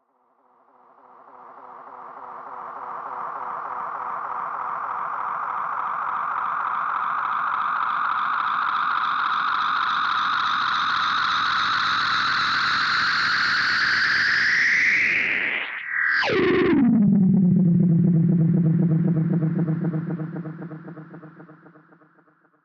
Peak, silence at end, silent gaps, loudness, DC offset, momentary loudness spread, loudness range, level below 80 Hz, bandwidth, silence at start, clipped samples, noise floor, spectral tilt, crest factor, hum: -8 dBFS; 1.1 s; none; -21 LUFS; under 0.1%; 15 LU; 12 LU; -62 dBFS; 7.4 kHz; 1.35 s; under 0.1%; -64 dBFS; -6 dB/octave; 14 dB; none